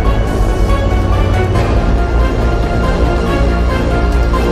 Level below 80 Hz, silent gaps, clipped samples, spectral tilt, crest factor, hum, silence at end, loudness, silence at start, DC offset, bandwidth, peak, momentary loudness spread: -14 dBFS; none; under 0.1%; -7 dB/octave; 10 dB; none; 0 s; -14 LUFS; 0 s; under 0.1%; 11.5 kHz; 0 dBFS; 1 LU